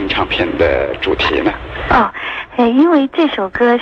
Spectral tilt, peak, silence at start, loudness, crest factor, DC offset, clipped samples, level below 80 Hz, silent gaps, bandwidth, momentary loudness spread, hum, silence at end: -6.5 dB/octave; -2 dBFS; 0 s; -14 LUFS; 12 dB; under 0.1%; under 0.1%; -34 dBFS; none; 7 kHz; 7 LU; none; 0 s